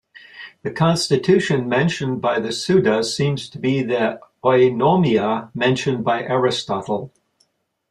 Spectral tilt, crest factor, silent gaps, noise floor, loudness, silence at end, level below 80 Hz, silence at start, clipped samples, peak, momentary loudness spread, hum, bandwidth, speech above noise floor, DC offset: -5.5 dB/octave; 16 dB; none; -65 dBFS; -19 LUFS; 0.85 s; -58 dBFS; 0.35 s; under 0.1%; -2 dBFS; 8 LU; none; 12.5 kHz; 47 dB; under 0.1%